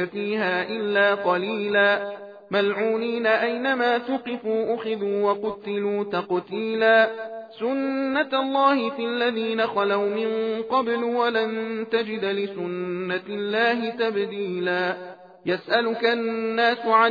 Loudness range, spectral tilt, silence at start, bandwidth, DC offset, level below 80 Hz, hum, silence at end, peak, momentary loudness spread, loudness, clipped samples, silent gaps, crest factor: 3 LU; -7 dB/octave; 0 s; 5 kHz; under 0.1%; -74 dBFS; none; 0 s; -6 dBFS; 8 LU; -23 LUFS; under 0.1%; none; 18 dB